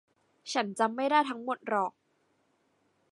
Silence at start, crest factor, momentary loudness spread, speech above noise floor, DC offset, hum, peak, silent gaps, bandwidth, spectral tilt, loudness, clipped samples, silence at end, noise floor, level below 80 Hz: 0.45 s; 20 dB; 9 LU; 43 dB; under 0.1%; none; -12 dBFS; none; 11.5 kHz; -3.5 dB/octave; -30 LUFS; under 0.1%; 1.2 s; -73 dBFS; -88 dBFS